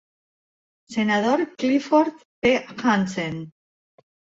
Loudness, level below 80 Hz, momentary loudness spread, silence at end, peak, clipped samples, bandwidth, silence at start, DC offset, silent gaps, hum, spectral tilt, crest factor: -22 LUFS; -60 dBFS; 11 LU; 0.85 s; -6 dBFS; under 0.1%; 8 kHz; 0.9 s; under 0.1%; 2.25-2.42 s; none; -5.5 dB/octave; 18 dB